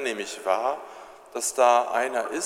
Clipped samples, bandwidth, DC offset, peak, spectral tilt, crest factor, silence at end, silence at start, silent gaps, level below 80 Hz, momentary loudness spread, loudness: under 0.1%; 16 kHz; under 0.1%; -6 dBFS; -1 dB/octave; 20 dB; 0 s; 0 s; none; -72 dBFS; 18 LU; -24 LUFS